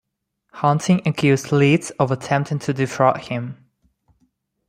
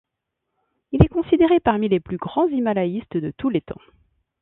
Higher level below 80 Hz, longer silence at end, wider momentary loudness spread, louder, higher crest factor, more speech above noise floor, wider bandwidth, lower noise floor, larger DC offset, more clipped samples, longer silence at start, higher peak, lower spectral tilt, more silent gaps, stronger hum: second, -58 dBFS vs -38 dBFS; first, 1.15 s vs 0.65 s; about the same, 9 LU vs 11 LU; about the same, -19 LUFS vs -21 LUFS; about the same, 20 dB vs 22 dB; second, 56 dB vs 60 dB; first, 14.5 kHz vs 4 kHz; second, -75 dBFS vs -80 dBFS; neither; neither; second, 0.55 s vs 0.9 s; about the same, -2 dBFS vs 0 dBFS; second, -6.5 dB/octave vs -11.5 dB/octave; neither; neither